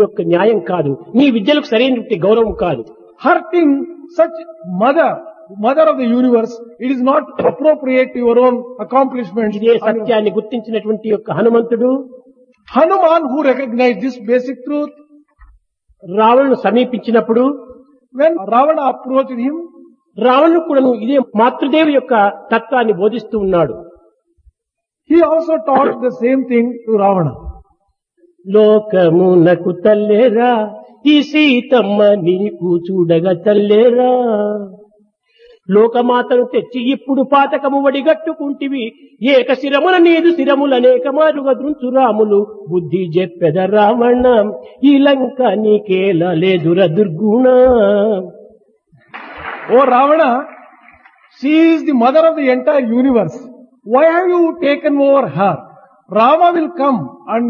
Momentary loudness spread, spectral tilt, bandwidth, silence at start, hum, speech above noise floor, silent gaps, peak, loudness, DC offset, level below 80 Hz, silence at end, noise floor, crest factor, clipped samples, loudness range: 10 LU; -8 dB/octave; 6.8 kHz; 0 s; none; 66 dB; none; 0 dBFS; -13 LUFS; under 0.1%; -48 dBFS; 0 s; -79 dBFS; 12 dB; under 0.1%; 4 LU